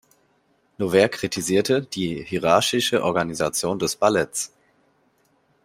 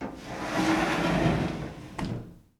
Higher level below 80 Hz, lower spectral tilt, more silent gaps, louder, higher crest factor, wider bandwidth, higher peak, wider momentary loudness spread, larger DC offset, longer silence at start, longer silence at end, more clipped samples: second, -58 dBFS vs -46 dBFS; second, -3.5 dB/octave vs -5.5 dB/octave; neither; first, -22 LUFS vs -29 LUFS; first, 22 dB vs 16 dB; about the same, 16 kHz vs 15.5 kHz; first, -2 dBFS vs -12 dBFS; second, 9 LU vs 12 LU; neither; first, 0.8 s vs 0 s; first, 1.2 s vs 0.2 s; neither